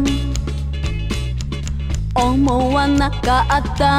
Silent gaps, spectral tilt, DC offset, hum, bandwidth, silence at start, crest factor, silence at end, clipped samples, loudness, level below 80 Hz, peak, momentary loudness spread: none; -5.5 dB/octave; under 0.1%; none; 14 kHz; 0 s; 14 dB; 0 s; under 0.1%; -19 LUFS; -24 dBFS; -2 dBFS; 8 LU